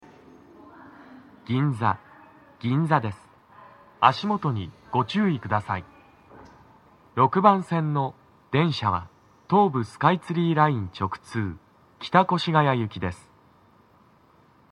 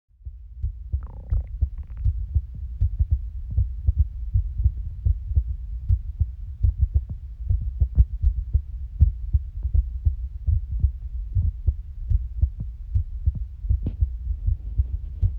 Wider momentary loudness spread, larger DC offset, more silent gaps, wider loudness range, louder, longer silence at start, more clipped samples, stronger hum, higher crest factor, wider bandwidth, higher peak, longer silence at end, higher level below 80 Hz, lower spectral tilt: first, 13 LU vs 9 LU; neither; neither; about the same, 5 LU vs 3 LU; first, -24 LUFS vs -27 LUFS; first, 0.85 s vs 0.2 s; neither; neither; first, 26 dB vs 20 dB; first, 11 kHz vs 1.1 kHz; first, 0 dBFS vs -4 dBFS; first, 1.55 s vs 0 s; second, -60 dBFS vs -26 dBFS; second, -7.5 dB/octave vs -11.5 dB/octave